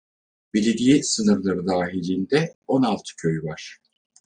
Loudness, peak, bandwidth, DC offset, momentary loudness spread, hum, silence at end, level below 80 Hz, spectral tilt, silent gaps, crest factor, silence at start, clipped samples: -22 LUFS; -6 dBFS; 10 kHz; under 0.1%; 10 LU; none; 0.6 s; -60 dBFS; -5 dB/octave; 2.55-2.62 s; 18 dB; 0.55 s; under 0.1%